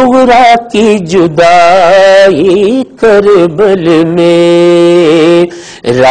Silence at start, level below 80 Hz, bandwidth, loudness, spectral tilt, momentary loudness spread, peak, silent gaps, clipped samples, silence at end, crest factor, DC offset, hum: 0 s; -40 dBFS; 10.5 kHz; -5 LUFS; -5.5 dB/octave; 5 LU; 0 dBFS; none; 7%; 0 s; 4 dB; under 0.1%; none